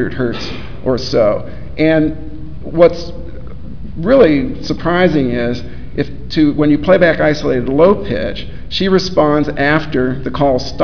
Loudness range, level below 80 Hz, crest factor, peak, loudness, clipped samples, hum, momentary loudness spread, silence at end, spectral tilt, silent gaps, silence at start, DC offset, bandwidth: 3 LU; -32 dBFS; 14 dB; 0 dBFS; -14 LUFS; 0.1%; none; 17 LU; 0 s; -7 dB/octave; none; 0 s; 6%; 5.4 kHz